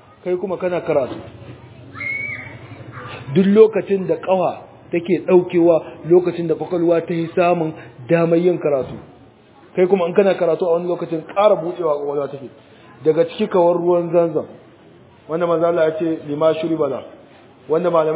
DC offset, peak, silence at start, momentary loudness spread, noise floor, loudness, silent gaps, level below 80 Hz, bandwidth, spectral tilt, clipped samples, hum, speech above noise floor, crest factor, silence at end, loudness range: under 0.1%; 0 dBFS; 0.25 s; 17 LU; -47 dBFS; -18 LUFS; none; -58 dBFS; 4 kHz; -11.5 dB/octave; under 0.1%; none; 30 dB; 18 dB; 0 s; 3 LU